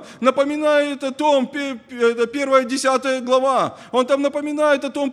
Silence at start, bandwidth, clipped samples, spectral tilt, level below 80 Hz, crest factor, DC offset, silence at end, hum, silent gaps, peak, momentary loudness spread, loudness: 0 s; 12.5 kHz; under 0.1%; -3.5 dB/octave; -68 dBFS; 16 dB; under 0.1%; 0 s; none; none; -2 dBFS; 5 LU; -19 LUFS